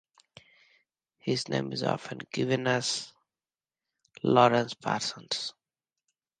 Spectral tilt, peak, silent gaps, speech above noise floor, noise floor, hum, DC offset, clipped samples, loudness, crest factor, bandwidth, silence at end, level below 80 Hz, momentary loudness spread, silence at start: -4.5 dB/octave; -6 dBFS; none; over 62 dB; under -90 dBFS; none; under 0.1%; under 0.1%; -29 LUFS; 24 dB; 9.8 kHz; 0.9 s; -72 dBFS; 13 LU; 1.25 s